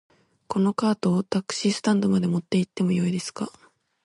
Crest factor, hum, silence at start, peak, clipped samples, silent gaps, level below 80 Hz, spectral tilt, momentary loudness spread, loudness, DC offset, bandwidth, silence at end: 16 dB; none; 0.5 s; -10 dBFS; under 0.1%; none; -64 dBFS; -6 dB/octave; 8 LU; -24 LUFS; under 0.1%; 11.5 kHz; 0.55 s